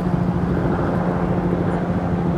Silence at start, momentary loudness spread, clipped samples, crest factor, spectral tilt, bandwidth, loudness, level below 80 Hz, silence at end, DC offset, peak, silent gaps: 0 s; 1 LU; under 0.1%; 12 dB; -9.5 dB/octave; 6.2 kHz; -21 LUFS; -34 dBFS; 0 s; under 0.1%; -6 dBFS; none